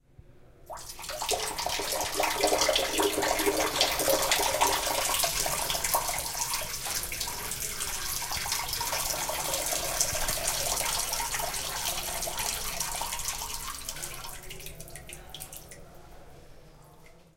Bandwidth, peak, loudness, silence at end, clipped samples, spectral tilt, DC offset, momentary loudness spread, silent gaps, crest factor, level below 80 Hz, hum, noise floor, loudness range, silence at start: 17 kHz; -8 dBFS; -28 LUFS; 0.15 s; under 0.1%; -1 dB/octave; under 0.1%; 17 LU; none; 22 dB; -46 dBFS; none; -53 dBFS; 11 LU; 0.3 s